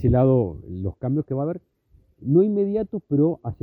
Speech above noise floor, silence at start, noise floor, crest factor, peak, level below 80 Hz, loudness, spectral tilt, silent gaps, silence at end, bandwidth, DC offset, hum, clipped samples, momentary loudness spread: 37 dB; 0 s; -59 dBFS; 14 dB; -8 dBFS; -44 dBFS; -23 LUFS; -13.5 dB/octave; none; 0.1 s; 4 kHz; under 0.1%; none; under 0.1%; 13 LU